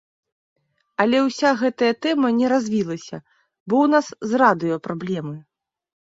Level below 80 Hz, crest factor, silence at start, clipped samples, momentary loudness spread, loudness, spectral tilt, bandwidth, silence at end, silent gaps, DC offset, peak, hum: -66 dBFS; 18 dB; 1 s; under 0.1%; 15 LU; -20 LUFS; -5.5 dB/octave; 7.8 kHz; 0.6 s; 3.60-3.66 s; under 0.1%; -2 dBFS; none